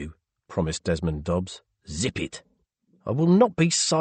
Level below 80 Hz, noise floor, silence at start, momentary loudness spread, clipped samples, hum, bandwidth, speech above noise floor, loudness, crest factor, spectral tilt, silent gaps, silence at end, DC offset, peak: -46 dBFS; -66 dBFS; 0 s; 19 LU; under 0.1%; none; 8.8 kHz; 43 dB; -24 LUFS; 18 dB; -5 dB/octave; none; 0 s; under 0.1%; -8 dBFS